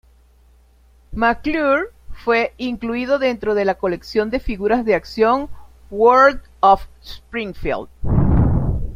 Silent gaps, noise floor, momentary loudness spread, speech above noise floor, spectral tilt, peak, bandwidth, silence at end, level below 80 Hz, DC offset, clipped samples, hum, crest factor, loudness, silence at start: none; -51 dBFS; 12 LU; 34 dB; -7.5 dB/octave; -2 dBFS; 15 kHz; 0 s; -30 dBFS; under 0.1%; under 0.1%; none; 16 dB; -18 LUFS; 1.1 s